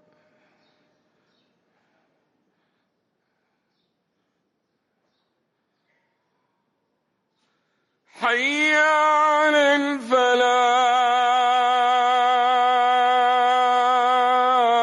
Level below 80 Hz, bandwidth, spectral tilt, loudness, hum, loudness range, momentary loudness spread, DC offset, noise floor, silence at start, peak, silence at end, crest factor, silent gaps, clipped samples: -74 dBFS; 11.5 kHz; -1 dB/octave; -18 LUFS; none; 6 LU; 3 LU; under 0.1%; -74 dBFS; 8.15 s; -8 dBFS; 0 s; 14 dB; none; under 0.1%